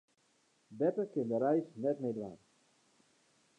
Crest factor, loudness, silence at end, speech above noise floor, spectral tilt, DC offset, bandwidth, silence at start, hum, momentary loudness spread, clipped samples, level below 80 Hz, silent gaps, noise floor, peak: 18 dB; -35 LUFS; 1.25 s; 39 dB; -9 dB/octave; under 0.1%; 10 kHz; 0.7 s; none; 9 LU; under 0.1%; -82 dBFS; none; -74 dBFS; -20 dBFS